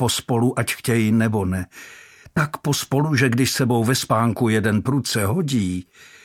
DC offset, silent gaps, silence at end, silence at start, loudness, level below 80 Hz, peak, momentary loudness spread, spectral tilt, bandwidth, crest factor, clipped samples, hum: under 0.1%; none; 0.2 s; 0 s; -20 LUFS; -52 dBFS; -4 dBFS; 9 LU; -5 dB/octave; 17 kHz; 16 dB; under 0.1%; none